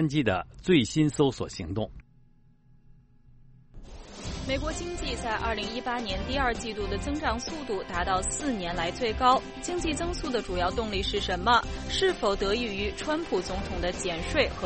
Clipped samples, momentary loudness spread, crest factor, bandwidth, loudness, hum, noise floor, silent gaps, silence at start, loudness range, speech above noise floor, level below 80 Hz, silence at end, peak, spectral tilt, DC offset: under 0.1%; 9 LU; 20 dB; 8.8 kHz; -28 LUFS; none; -58 dBFS; none; 0 s; 8 LU; 30 dB; -40 dBFS; 0 s; -8 dBFS; -4.5 dB/octave; under 0.1%